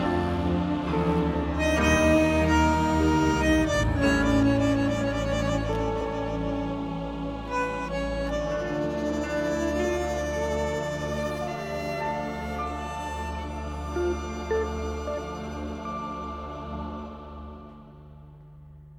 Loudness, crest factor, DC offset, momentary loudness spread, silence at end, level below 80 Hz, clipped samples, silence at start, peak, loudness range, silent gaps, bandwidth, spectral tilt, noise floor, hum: -27 LUFS; 16 dB; under 0.1%; 13 LU; 0 s; -36 dBFS; under 0.1%; 0 s; -10 dBFS; 10 LU; none; 16 kHz; -6 dB/octave; -47 dBFS; none